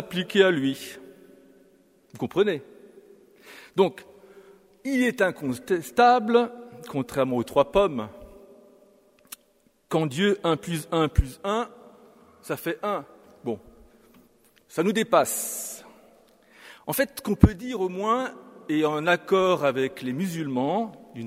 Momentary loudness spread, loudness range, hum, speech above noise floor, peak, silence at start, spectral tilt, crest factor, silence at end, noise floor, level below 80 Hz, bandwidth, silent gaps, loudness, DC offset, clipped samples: 16 LU; 6 LU; none; 40 dB; 0 dBFS; 0 s; -5.5 dB/octave; 26 dB; 0 s; -64 dBFS; -42 dBFS; 16 kHz; none; -25 LUFS; under 0.1%; under 0.1%